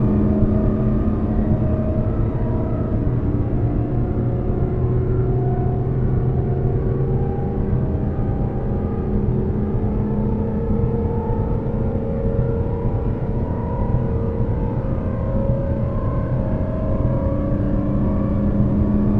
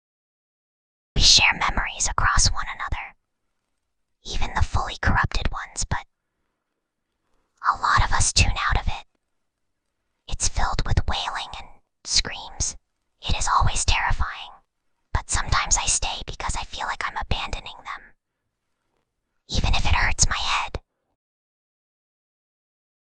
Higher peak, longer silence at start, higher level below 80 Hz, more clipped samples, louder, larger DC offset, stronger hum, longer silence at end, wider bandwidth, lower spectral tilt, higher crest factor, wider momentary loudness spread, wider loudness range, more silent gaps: about the same, -4 dBFS vs -2 dBFS; second, 0 s vs 1.15 s; about the same, -26 dBFS vs -30 dBFS; neither; about the same, -21 LUFS vs -23 LUFS; neither; neither; second, 0 s vs 2.25 s; second, 3.6 kHz vs 10 kHz; first, -12.5 dB/octave vs -1.5 dB/octave; second, 16 dB vs 22 dB; second, 4 LU vs 15 LU; second, 2 LU vs 8 LU; neither